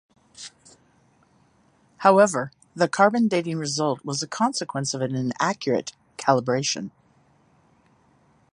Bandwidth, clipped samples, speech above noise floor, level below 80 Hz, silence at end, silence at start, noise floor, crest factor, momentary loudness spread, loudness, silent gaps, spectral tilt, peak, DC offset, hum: 11 kHz; under 0.1%; 39 dB; -70 dBFS; 1.65 s; 0.4 s; -61 dBFS; 22 dB; 18 LU; -23 LUFS; none; -4.5 dB/octave; -4 dBFS; under 0.1%; none